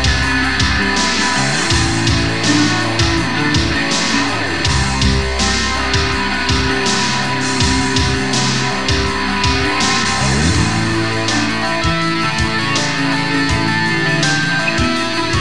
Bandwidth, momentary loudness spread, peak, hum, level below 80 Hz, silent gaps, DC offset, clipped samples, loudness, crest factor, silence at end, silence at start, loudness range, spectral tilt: 12 kHz; 2 LU; 0 dBFS; none; -26 dBFS; none; 4%; under 0.1%; -15 LUFS; 14 dB; 0 s; 0 s; 1 LU; -3.5 dB/octave